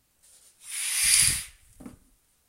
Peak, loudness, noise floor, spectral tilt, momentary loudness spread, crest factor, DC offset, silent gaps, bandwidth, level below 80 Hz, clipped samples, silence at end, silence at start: -4 dBFS; -22 LUFS; -64 dBFS; 1 dB/octave; 18 LU; 24 dB; under 0.1%; none; 16 kHz; -52 dBFS; under 0.1%; 0.6 s; 0.65 s